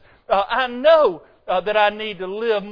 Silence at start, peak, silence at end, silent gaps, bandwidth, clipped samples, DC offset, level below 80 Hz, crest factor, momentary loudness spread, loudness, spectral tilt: 0.3 s; -2 dBFS; 0 s; none; 5.2 kHz; under 0.1%; under 0.1%; -52 dBFS; 16 dB; 12 LU; -19 LUFS; -6 dB/octave